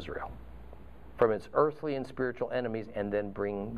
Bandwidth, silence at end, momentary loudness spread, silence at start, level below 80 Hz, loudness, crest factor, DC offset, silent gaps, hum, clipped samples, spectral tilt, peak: 10.5 kHz; 0 s; 22 LU; 0 s; -54 dBFS; -32 LUFS; 22 dB; 0.3%; none; none; under 0.1%; -8 dB/octave; -10 dBFS